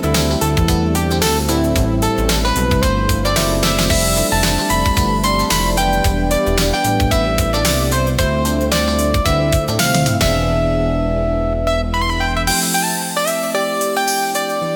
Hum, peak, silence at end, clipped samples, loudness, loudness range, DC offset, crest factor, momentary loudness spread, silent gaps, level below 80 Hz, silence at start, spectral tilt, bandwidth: none; -2 dBFS; 0 s; under 0.1%; -16 LUFS; 2 LU; under 0.1%; 14 dB; 3 LU; none; -24 dBFS; 0 s; -4.5 dB/octave; 19 kHz